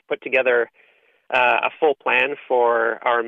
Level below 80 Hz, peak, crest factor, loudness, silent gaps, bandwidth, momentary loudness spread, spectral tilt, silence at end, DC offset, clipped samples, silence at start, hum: -70 dBFS; -6 dBFS; 16 dB; -19 LUFS; none; 5.4 kHz; 4 LU; -5 dB/octave; 0 s; under 0.1%; under 0.1%; 0.1 s; none